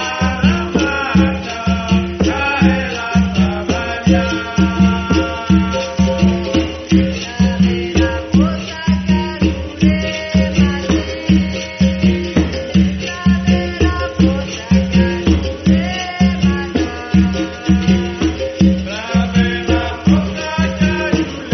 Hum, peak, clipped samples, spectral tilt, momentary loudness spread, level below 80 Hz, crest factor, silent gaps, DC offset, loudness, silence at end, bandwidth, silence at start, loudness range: none; 0 dBFS; under 0.1%; -5.5 dB/octave; 5 LU; -28 dBFS; 14 dB; none; under 0.1%; -15 LUFS; 0 s; 6.4 kHz; 0 s; 1 LU